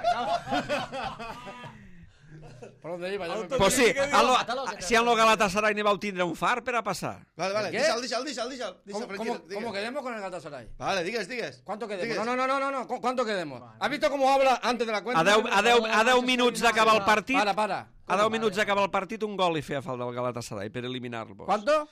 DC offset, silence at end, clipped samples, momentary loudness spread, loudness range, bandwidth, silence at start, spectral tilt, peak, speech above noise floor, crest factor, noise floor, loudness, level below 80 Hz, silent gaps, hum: under 0.1%; 0.05 s; under 0.1%; 15 LU; 10 LU; 15.5 kHz; 0 s; -3.5 dB/octave; -10 dBFS; 23 dB; 16 dB; -50 dBFS; -26 LUFS; -56 dBFS; none; none